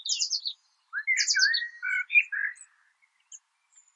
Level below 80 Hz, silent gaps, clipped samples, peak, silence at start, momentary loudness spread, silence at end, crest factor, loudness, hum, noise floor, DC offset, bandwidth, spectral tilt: under -90 dBFS; none; under 0.1%; -10 dBFS; 0 s; 13 LU; 0.6 s; 20 dB; -25 LUFS; none; -68 dBFS; under 0.1%; 9.8 kHz; 11 dB/octave